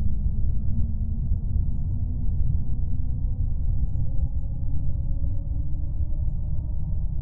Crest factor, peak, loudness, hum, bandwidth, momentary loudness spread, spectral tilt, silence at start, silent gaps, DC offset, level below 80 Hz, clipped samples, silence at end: 12 dB; -10 dBFS; -29 LUFS; none; 1 kHz; 3 LU; -15 dB/octave; 0 s; none; under 0.1%; -26 dBFS; under 0.1%; 0 s